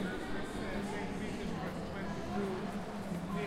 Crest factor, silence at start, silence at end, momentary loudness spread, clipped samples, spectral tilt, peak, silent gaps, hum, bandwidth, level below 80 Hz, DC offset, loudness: 14 dB; 0 s; 0 s; 3 LU; under 0.1%; -6 dB/octave; -24 dBFS; none; none; 16 kHz; -52 dBFS; under 0.1%; -40 LUFS